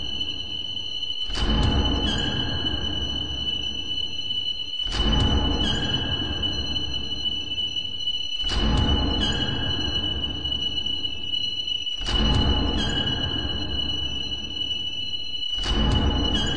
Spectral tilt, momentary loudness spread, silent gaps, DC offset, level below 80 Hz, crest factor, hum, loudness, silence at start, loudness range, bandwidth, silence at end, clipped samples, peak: -4.5 dB/octave; 5 LU; none; 2%; -30 dBFS; 16 dB; none; -24 LUFS; 0 s; 1 LU; 9.8 kHz; 0 s; under 0.1%; -8 dBFS